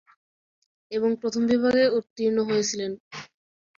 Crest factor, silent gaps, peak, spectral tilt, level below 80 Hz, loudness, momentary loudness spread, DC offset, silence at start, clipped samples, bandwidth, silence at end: 16 dB; 2.10-2.16 s, 3.00-3.11 s; -10 dBFS; -4 dB/octave; -66 dBFS; -24 LUFS; 15 LU; under 0.1%; 0.9 s; under 0.1%; 7.6 kHz; 0.55 s